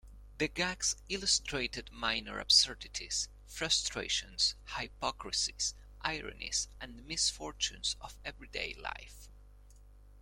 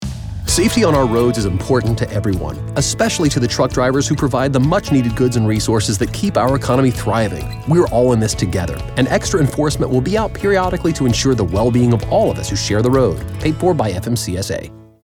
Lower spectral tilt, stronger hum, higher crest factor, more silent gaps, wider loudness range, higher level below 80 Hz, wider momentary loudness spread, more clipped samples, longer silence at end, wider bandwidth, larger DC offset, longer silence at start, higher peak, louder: second, -0.5 dB/octave vs -5.5 dB/octave; first, 50 Hz at -55 dBFS vs none; first, 24 dB vs 12 dB; neither; first, 6 LU vs 1 LU; second, -54 dBFS vs -32 dBFS; first, 12 LU vs 7 LU; neither; second, 0 s vs 0.2 s; about the same, 16.5 kHz vs 18 kHz; neither; about the same, 0.05 s vs 0 s; second, -12 dBFS vs -4 dBFS; second, -33 LUFS vs -16 LUFS